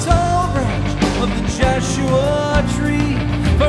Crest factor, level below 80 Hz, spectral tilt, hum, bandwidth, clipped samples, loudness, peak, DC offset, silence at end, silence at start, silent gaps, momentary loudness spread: 14 dB; -24 dBFS; -6 dB/octave; none; 12 kHz; under 0.1%; -17 LUFS; -2 dBFS; under 0.1%; 0 s; 0 s; none; 3 LU